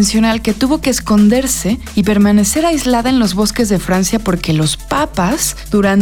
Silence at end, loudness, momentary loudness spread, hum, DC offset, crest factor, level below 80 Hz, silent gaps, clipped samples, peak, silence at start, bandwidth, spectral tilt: 0 s; -13 LUFS; 5 LU; none; under 0.1%; 10 dB; -30 dBFS; none; under 0.1%; -2 dBFS; 0 s; 19 kHz; -4.5 dB/octave